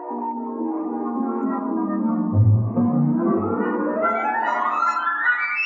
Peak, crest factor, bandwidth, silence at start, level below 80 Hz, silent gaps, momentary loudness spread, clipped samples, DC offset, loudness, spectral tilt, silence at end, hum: -8 dBFS; 14 dB; 7.2 kHz; 0 s; -64 dBFS; none; 8 LU; under 0.1%; under 0.1%; -22 LUFS; -9 dB/octave; 0 s; none